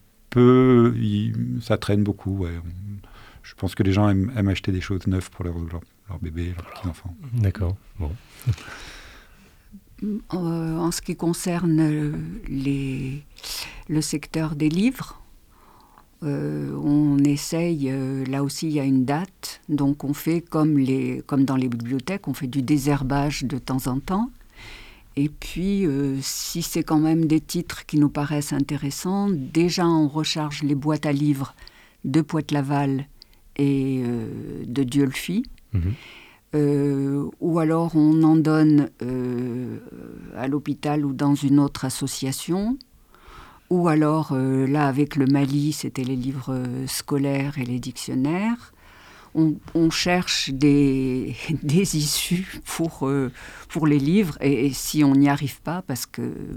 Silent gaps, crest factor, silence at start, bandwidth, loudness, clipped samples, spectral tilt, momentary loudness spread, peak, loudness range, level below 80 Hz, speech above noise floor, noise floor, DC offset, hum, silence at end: none; 18 dB; 0.3 s; 17.5 kHz; -23 LUFS; under 0.1%; -6 dB/octave; 13 LU; -4 dBFS; 6 LU; -46 dBFS; 30 dB; -52 dBFS; under 0.1%; none; 0 s